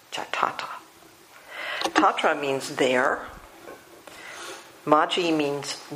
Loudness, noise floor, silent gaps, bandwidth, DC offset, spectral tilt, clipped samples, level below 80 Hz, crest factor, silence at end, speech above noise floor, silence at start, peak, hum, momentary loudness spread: -24 LUFS; -51 dBFS; none; 15.5 kHz; under 0.1%; -3.5 dB/octave; under 0.1%; -64 dBFS; 24 dB; 0 s; 28 dB; 0.1 s; -2 dBFS; none; 23 LU